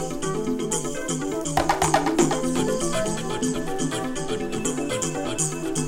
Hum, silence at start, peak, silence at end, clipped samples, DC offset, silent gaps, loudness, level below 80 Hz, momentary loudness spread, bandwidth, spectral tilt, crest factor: none; 0 s; -4 dBFS; 0 s; under 0.1%; under 0.1%; none; -25 LUFS; -40 dBFS; 7 LU; 16.5 kHz; -4 dB/octave; 20 dB